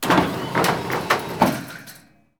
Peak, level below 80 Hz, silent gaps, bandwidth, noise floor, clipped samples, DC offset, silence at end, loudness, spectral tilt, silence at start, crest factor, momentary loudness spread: -2 dBFS; -52 dBFS; none; over 20 kHz; -48 dBFS; under 0.1%; 0.1%; 0.45 s; -21 LUFS; -4.5 dB/octave; 0 s; 20 dB; 17 LU